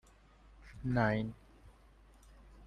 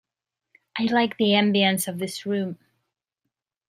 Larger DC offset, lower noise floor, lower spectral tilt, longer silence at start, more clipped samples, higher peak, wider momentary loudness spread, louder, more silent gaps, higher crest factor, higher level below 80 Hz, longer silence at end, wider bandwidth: neither; second, -62 dBFS vs -86 dBFS; first, -8 dB/octave vs -4.5 dB/octave; second, 0.6 s vs 0.75 s; neither; second, -16 dBFS vs -6 dBFS; first, 25 LU vs 14 LU; second, -35 LUFS vs -23 LUFS; neither; about the same, 24 dB vs 20 dB; first, -56 dBFS vs -72 dBFS; second, 0 s vs 1.15 s; second, 10.5 kHz vs 15.5 kHz